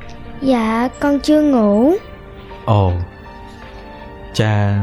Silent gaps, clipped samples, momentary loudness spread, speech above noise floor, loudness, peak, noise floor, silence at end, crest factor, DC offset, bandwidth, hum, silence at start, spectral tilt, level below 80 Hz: none; under 0.1%; 22 LU; 21 dB; -16 LUFS; -4 dBFS; -35 dBFS; 0 s; 14 dB; under 0.1%; 12.5 kHz; none; 0 s; -7.5 dB/octave; -38 dBFS